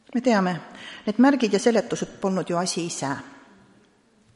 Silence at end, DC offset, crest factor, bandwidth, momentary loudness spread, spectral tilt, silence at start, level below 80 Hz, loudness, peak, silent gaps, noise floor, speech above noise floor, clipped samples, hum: 1 s; under 0.1%; 18 dB; 11.5 kHz; 13 LU; -5 dB/octave; 0.1 s; -66 dBFS; -23 LUFS; -6 dBFS; none; -60 dBFS; 37 dB; under 0.1%; none